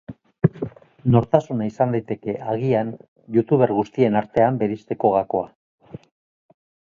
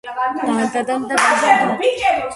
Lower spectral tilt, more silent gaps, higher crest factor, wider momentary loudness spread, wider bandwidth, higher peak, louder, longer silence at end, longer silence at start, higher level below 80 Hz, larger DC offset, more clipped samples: first, -9.5 dB/octave vs -3 dB/octave; first, 3.08-3.16 s, 5.55-5.78 s vs none; first, 22 dB vs 16 dB; first, 12 LU vs 7 LU; second, 7.2 kHz vs 11.5 kHz; about the same, 0 dBFS vs 0 dBFS; second, -21 LUFS vs -16 LUFS; first, 0.9 s vs 0 s; about the same, 0.1 s vs 0.05 s; about the same, -54 dBFS vs -54 dBFS; neither; neither